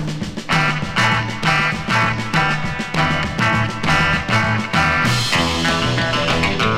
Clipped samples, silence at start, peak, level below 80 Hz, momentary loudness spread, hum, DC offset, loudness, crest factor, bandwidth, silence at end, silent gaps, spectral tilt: under 0.1%; 0 s; -2 dBFS; -36 dBFS; 3 LU; none; under 0.1%; -17 LUFS; 16 dB; 16 kHz; 0 s; none; -4.5 dB/octave